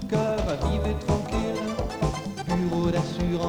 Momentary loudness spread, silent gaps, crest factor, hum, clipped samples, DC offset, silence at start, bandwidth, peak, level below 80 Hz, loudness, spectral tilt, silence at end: 4 LU; none; 16 dB; none; under 0.1%; under 0.1%; 0 s; 16 kHz; -10 dBFS; -34 dBFS; -27 LUFS; -6.5 dB/octave; 0 s